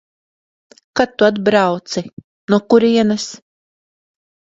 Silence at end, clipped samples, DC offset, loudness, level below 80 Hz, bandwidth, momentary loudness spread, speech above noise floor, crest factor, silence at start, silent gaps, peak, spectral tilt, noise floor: 1.15 s; under 0.1%; under 0.1%; -16 LUFS; -56 dBFS; 7.8 kHz; 14 LU; over 75 dB; 18 dB; 0.95 s; 2.13-2.17 s, 2.24-2.48 s; 0 dBFS; -5 dB/octave; under -90 dBFS